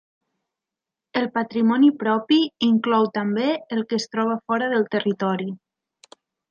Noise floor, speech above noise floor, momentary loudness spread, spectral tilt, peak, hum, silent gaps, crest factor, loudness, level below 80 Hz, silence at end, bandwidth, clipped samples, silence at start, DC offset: -87 dBFS; 66 dB; 8 LU; -6 dB/octave; -6 dBFS; none; none; 16 dB; -22 LUFS; -72 dBFS; 0.95 s; 7.2 kHz; under 0.1%; 1.15 s; under 0.1%